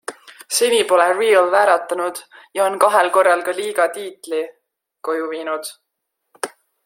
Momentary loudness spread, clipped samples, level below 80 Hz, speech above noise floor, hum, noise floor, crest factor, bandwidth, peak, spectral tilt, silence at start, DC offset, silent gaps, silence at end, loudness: 16 LU; under 0.1%; -74 dBFS; 59 dB; none; -76 dBFS; 18 dB; 16.5 kHz; 0 dBFS; -1 dB/octave; 0.1 s; under 0.1%; none; 0.35 s; -17 LUFS